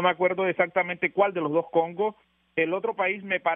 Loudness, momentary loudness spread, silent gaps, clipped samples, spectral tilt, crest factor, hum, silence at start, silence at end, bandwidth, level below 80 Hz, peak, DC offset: -26 LUFS; 4 LU; none; under 0.1%; -3 dB/octave; 18 dB; none; 0 s; 0 s; 3.8 kHz; -74 dBFS; -8 dBFS; under 0.1%